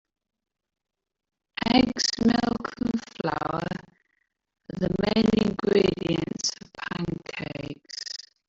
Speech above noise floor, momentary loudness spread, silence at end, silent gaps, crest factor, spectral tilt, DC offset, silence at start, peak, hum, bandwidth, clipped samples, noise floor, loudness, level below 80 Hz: 52 dB; 14 LU; 0.3 s; none; 20 dB; -4.5 dB/octave; under 0.1%; 1.6 s; -8 dBFS; none; 8 kHz; under 0.1%; -75 dBFS; -26 LUFS; -52 dBFS